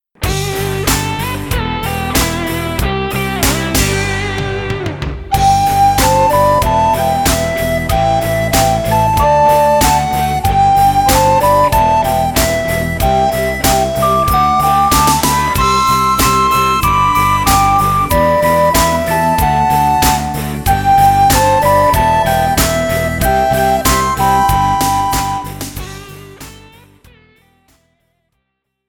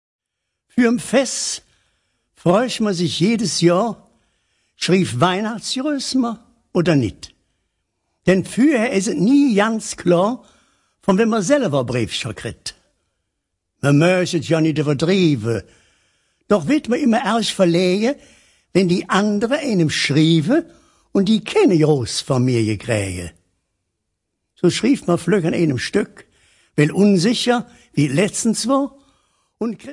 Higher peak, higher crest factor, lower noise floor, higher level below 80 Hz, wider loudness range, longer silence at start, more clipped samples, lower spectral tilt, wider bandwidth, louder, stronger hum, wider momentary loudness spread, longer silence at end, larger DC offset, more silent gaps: about the same, 0 dBFS vs -2 dBFS; second, 12 dB vs 18 dB; second, -70 dBFS vs -78 dBFS; first, -24 dBFS vs -56 dBFS; about the same, 5 LU vs 4 LU; second, 0.2 s vs 0.75 s; neither; second, -4 dB/octave vs -5.5 dB/octave; first, 19 kHz vs 11.5 kHz; first, -12 LUFS vs -18 LUFS; neither; about the same, 8 LU vs 10 LU; first, 2.35 s vs 0 s; neither; neither